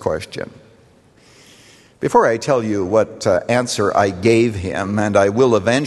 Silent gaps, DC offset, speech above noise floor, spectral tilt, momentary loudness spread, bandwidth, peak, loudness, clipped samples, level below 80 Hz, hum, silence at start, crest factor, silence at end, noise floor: none; under 0.1%; 34 dB; -5.5 dB/octave; 10 LU; 12.5 kHz; -2 dBFS; -17 LUFS; under 0.1%; -50 dBFS; none; 0 s; 16 dB; 0 s; -50 dBFS